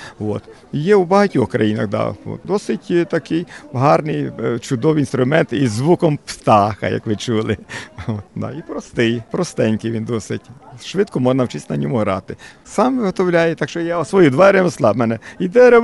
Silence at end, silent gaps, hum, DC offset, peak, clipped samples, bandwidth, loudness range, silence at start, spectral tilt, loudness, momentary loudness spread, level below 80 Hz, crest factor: 0 s; none; none; 0.1%; -2 dBFS; under 0.1%; 11.5 kHz; 6 LU; 0 s; -6.5 dB/octave; -17 LUFS; 13 LU; -52 dBFS; 14 dB